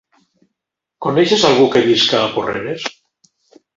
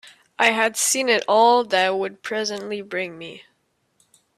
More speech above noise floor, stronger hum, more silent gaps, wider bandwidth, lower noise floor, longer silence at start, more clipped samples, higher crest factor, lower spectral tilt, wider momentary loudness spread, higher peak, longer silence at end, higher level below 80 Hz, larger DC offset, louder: first, 65 dB vs 48 dB; neither; neither; second, 7.8 kHz vs 15.5 kHz; first, -79 dBFS vs -69 dBFS; first, 1 s vs 0.05 s; neither; about the same, 16 dB vs 20 dB; first, -4 dB/octave vs -1.5 dB/octave; about the same, 13 LU vs 14 LU; first, 0 dBFS vs -4 dBFS; second, 0.85 s vs 1 s; first, -56 dBFS vs -72 dBFS; neither; first, -14 LUFS vs -20 LUFS